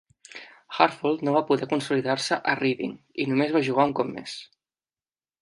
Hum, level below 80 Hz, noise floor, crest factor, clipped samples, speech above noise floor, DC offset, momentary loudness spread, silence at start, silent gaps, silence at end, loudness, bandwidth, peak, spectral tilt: none; -72 dBFS; under -90 dBFS; 24 dB; under 0.1%; over 65 dB; under 0.1%; 16 LU; 0.35 s; none; 0.95 s; -25 LUFS; 11.5 kHz; -2 dBFS; -5 dB/octave